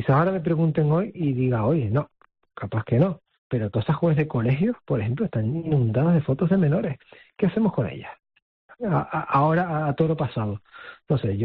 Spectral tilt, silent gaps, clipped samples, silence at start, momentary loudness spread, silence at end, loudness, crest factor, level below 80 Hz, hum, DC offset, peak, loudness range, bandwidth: -8.5 dB/octave; 3.38-3.50 s, 8.42-8.69 s; under 0.1%; 0 s; 11 LU; 0 s; -24 LUFS; 14 dB; -54 dBFS; none; under 0.1%; -10 dBFS; 2 LU; 4.5 kHz